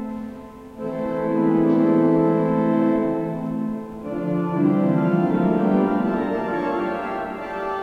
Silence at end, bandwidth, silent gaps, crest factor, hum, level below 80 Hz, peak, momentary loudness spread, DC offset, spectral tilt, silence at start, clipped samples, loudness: 0 s; 5.6 kHz; none; 14 dB; none; -52 dBFS; -6 dBFS; 13 LU; under 0.1%; -9.5 dB/octave; 0 s; under 0.1%; -21 LUFS